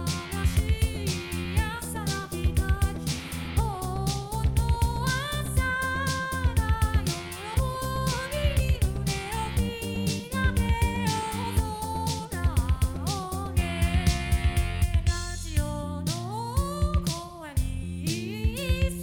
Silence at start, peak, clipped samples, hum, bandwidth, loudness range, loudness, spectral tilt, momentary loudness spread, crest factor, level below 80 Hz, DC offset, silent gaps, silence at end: 0 s; -10 dBFS; under 0.1%; none; 18 kHz; 2 LU; -28 LUFS; -5 dB/octave; 5 LU; 16 dB; -32 dBFS; under 0.1%; none; 0 s